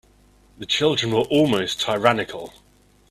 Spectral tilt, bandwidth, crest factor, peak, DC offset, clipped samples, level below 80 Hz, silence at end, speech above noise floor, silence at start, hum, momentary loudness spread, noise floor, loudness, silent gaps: -4.5 dB/octave; 14.5 kHz; 22 dB; 0 dBFS; under 0.1%; under 0.1%; -54 dBFS; 0.6 s; 34 dB; 0.6 s; 50 Hz at -45 dBFS; 17 LU; -55 dBFS; -20 LUFS; none